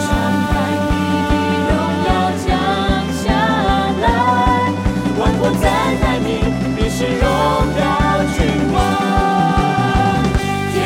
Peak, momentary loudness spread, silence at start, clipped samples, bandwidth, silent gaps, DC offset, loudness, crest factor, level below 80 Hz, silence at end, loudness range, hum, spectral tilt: 0 dBFS; 3 LU; 0 s; under 0.1%; 16.5 kHz; none; under 0.1%; -16 LUFS; 14 dB; -24 dBFS; 0 s; 1 LU; none; -6 dB/octave